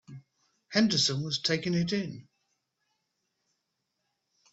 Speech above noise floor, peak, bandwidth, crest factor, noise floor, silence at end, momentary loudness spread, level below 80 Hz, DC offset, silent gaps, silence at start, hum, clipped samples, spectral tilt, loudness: 53 dB; -12 dBFS; 8 kHz; 22 dB; -82 dBFS; 2.3 s; 11 LU; -70 dBFS; under 0.1%; none; 0.1 s; none; under 0.1%; -4 dB/octave; -28 LUFS